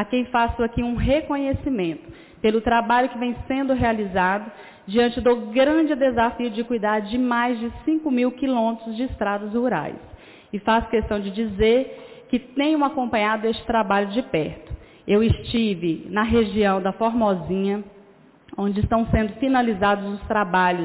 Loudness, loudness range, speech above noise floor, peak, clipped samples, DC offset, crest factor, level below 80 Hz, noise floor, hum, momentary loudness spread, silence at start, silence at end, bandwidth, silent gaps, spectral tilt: -22 LUFS; 2 LU; 30 dB; -10 dBFS; under 0.1%; under 0.1%; 12 dB; -40 dBFS; -51 dBFS; none; 8 LU; 0 s; 0 s; 4 kHz; none; -10.5 dB/octave